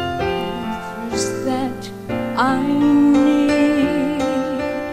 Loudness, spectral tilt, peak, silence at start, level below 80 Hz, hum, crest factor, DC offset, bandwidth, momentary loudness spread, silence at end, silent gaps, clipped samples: -18 LUFS; -5.5 dB/octave; -4 dBFS; 0 s; -44 dBFS; none; 14 dB; 0.4%; 14 kHz; 12 LU; 0 s; none; under 0.1%